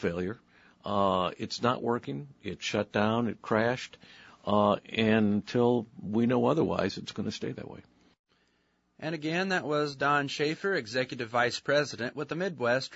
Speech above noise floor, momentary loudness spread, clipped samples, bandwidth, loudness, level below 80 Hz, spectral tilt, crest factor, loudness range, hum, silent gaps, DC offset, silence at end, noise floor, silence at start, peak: 43 dB; 12 LU; under 0.1%; 8 kHz; -29 LUFS; -66 dBFS; -5.5 dB/octave; 20 dB; 5 LU; none; 8.19-8.24 s; under 0.1%; 0 s; -72 dBFS; 0 s; -10 dBFS